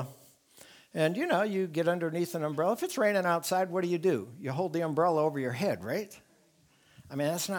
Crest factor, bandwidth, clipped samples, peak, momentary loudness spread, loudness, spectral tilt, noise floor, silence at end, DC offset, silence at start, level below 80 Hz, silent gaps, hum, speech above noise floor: 18 dB; 19.5 kHz; under 0.1%; -14 dBFS; 8 LU; -30 LUFS; -5.5 dB/octave; -65 dBFS; 0 s; under 0.1%; 0 s; -76 dBFS; none; none; 36 dB